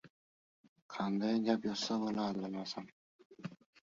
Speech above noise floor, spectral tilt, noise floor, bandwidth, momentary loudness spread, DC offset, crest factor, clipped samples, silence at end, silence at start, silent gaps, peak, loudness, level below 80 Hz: over 54 dB; -4.5 dB/octave; under -90 dBFS; 7.4 kHz; 17 LU; under 0.1%; 22 dB; under 0.1%; 0.4 s; 0.05 s; 0.10-0.76 s, 0.82-0.89 s, 2.92-3.19 s, 3.25-3.30 s; -18 dBFS; -37 LUFS; -78 dBFS